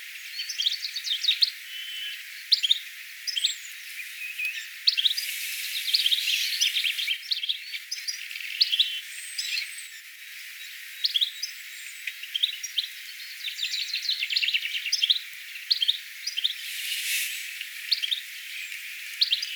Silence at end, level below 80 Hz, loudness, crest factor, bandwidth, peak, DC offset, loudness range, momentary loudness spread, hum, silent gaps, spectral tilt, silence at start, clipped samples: 0 s; under -90 dBFS; -26 LUFS; 24 dB; over 20 kHz; -6 dBFS; under 0.1%; 5 LU; 14 LU; none; none; 13.5 dB/octave; 0 s; under 0.1%